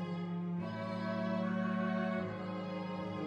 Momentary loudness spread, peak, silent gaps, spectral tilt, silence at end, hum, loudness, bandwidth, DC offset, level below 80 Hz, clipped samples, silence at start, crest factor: 5 LU; -24 dBFS; none; -8.5 dB/octave; 0 s; none; -38 LUFS; 7 kHz; under 0.1%; -74 dBFS; under 0.1%; 0 s; 14 dB